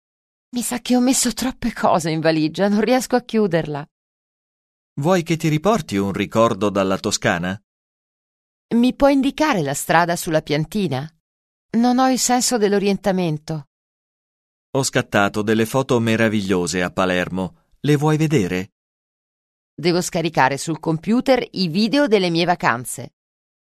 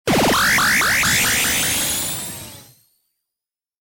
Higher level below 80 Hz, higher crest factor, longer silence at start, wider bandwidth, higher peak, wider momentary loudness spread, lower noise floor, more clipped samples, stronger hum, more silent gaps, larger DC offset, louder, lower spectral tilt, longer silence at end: second, -50 dBFS vs -42 dBFS; first, 18 dB vs 12 dB; first, 0.55 s vs 0.05 s; second, 13.5 kHz vs 17 kHz; first, 0 dBFS vs -8 dBFS; second, 9 LU vs 14 LU; about the same, under -90 dBFS vs -87 dBFS; neither; neither; first, 3.91-4.96 s, 7.64-8.69 s, 11.20-11.69 s, 13.67-14.73 s, 18.72-19.77 s vs none; neither; second, -19 LUFS vs -16 LUFS; first, -4.5 dB/octave vs -1.5 dB/octave; second, 0.55 s vs 1.2 s